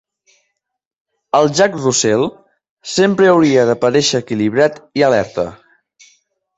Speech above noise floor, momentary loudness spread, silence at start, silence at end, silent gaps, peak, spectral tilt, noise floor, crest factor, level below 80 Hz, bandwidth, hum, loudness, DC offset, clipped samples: 56 dB; 11 LU; 1.35 s; 1 s; 2.70-2.77 s; 0 dBFS; -4 dB/octave; -69 dBFS; 14 dB; -54 dBFS; 8.4 kHz; none; -14 LUFS; under 0.1%; under 0.1%